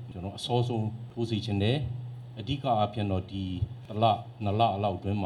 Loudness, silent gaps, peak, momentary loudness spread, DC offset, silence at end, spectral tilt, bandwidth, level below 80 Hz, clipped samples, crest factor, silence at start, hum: -30 LUFS; none; -10 dBFS; 9 LU; under 0.1%; 0 s; -7.5 dB/octave; 11 kHz; -54 dBFS; under 0.1%; 18 dB; 0 s; none